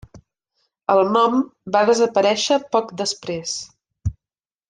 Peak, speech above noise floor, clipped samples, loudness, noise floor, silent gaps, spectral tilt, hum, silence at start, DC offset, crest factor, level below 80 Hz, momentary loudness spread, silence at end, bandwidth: -4 dBFS; over 71 dB; under 0.1%; -20 LUFS; under -90 dBFS; none; -4 dB/octave; none; 0.15 s; under 0.1%; 18 dB; -46 dBFS; 14 LU; 0.55 s; 10 kHz